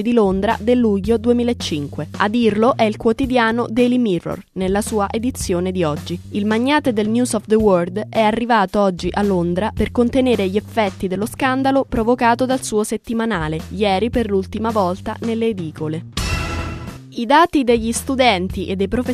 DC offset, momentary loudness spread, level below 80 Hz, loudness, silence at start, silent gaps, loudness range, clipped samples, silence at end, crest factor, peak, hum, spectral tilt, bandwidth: under 0.1%; 8 LU; -36 dBFS; -18 LUFS; 0 s; none; 3 LU; under 0.1%; 0 s; 18 dB; 0 dBFS; none; -5.5 dB/octave; 14 kHz